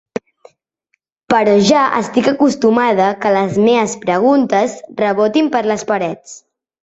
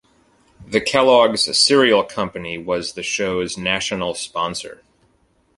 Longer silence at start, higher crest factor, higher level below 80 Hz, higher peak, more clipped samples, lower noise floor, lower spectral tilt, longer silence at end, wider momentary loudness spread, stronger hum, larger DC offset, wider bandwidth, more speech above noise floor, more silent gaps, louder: first, 1.3 s vs 0.6 s; about the same, 14 dB vs 18 dB; about the same, -56 dBFS vs -52 dBFS; about the same, 0 dBFS vs -2 dBFS; neither; first, -67 dBFS vs -61 dBFS; first, -5 dB/octave vs -3 dB/octave; second, 0.45 s vs 0.85 s; second, 8 LU vs 12 LU; neither; neither; second, 8.2 kHz vs 11.5 kHz; first, 54 dB vs 42 dB; neither; first, -14 LUFS vs -18 LUFS